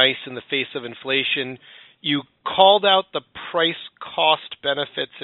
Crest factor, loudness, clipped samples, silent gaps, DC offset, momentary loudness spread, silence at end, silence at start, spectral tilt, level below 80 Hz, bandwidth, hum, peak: 22 dB; -20 LUFS; under 0.1%; none; under 0.1%; 15 LU; 0 s; 0 s; 0 dB/octave; -68 dBFS; 4.2 kHz; none; 0 dBFS